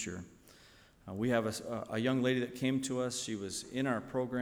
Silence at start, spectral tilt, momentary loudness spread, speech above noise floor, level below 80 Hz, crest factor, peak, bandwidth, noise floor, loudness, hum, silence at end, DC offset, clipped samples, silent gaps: 0 s; -5 dB/octave; 12 LU; 26 dB; -66 dBFS; 18 dB; -18 dBFS; 19 kHz; -61 dBFS; -35 LUFS; none; 0 s; under 0.1%; under 0.1%; none